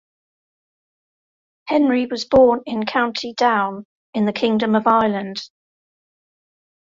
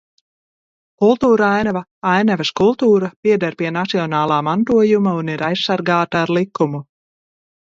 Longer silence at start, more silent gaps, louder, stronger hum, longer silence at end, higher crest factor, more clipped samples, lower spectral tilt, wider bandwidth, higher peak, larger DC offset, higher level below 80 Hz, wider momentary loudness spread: first, 1.65 s vs 1 s; first, 3.85-4.13 s vs 1.91-2.02 s, 3.16-3.23 s; about the same, -18 LUFS vs -17 LUFS; neither; first, 1.4 s vs 0.9 s; about the same, 18 dB vs 16 dB; neither; about the same, -5.5 dB/octave vs -6.5 dB/octave; about the same, 7.6 kHz vs 7.6 kHz; about the same, -2 dBFS vs 0 dBFS; neither; about the same, -56 dBFS vs -56 dBFS; first, 15 LU vs 7 LU